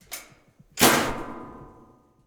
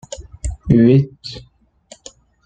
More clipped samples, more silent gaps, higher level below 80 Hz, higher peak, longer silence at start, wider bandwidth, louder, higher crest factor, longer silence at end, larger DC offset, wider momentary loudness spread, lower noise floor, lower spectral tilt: neither; neither; second, -48 dBFS vs -34 dBFS; about the same, -2 dBFS vs 0 dBFS; about the same, 0.1 s vs 0.1 s; first, over 20 kHz vs 9.2 kHz; second, -21 LUFS vs -14 LUFS; first, 24 dB vs 18 dB; second, 0.6 s vs 1.05 s; neither; about the same, 23 LU vs 22 LU; first, -56 dBFS vs -47 dBFS; second, -2.5 dB/octave vs -7.5 dB/octave